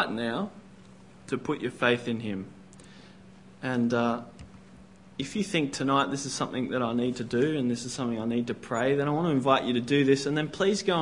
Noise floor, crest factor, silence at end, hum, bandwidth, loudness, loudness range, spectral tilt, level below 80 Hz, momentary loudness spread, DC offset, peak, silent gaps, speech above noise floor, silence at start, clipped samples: -52 dBFS; 20 dB; 0 s; none; 11 kHz; -28 LUFS; 6 LU; -5 dB/octave; -64 dBFS; 11 LU; 0.1%; -8 dBFS; none; 24 dB; 0 s; under 0.1%